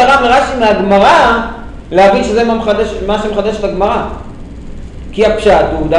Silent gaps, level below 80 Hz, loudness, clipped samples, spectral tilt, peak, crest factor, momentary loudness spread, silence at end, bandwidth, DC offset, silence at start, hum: none; -28 dBFS; -10 LUFS; under 0.1%; -5 dB/octave; 0 dBFS; 10 dB; 22 LU; 0 s; 11 kHz; under 0.1%; 0 s; none